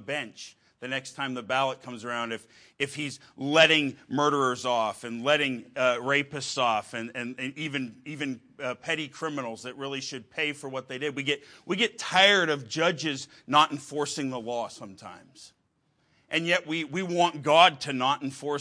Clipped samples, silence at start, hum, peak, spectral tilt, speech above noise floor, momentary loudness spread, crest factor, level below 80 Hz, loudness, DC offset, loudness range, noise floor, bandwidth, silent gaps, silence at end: under 0.1%; 0 s; none; -4 dBFS; -3.5 dB/octave; 44 dB; 16 LU; 24 dB; -74 dBFS; -27 LUFS; under 0.1%; 8 LU; -72 dBFS; 10.5 kHz; none; 0 s